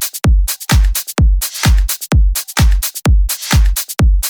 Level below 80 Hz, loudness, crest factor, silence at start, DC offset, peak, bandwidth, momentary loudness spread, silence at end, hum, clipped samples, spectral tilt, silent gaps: -14 dBFS; -14 LUFS; 10 dB; 0 s; under 0.1%; -2 dBFS; over 20 kHz; 2 LU; 0 s; none; under 0.1%; -4 dB/octave; none